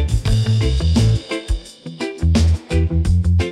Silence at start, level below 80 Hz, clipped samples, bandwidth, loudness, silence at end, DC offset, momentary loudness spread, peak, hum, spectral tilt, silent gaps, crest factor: 0 s; -24 dBFS; under 0.1%; 11.5 kHz; -18 LUFS; 0 s; under 0.1%; 11 LU; -4 dBFS; none; -6.5 dB/octave; none; 12 dB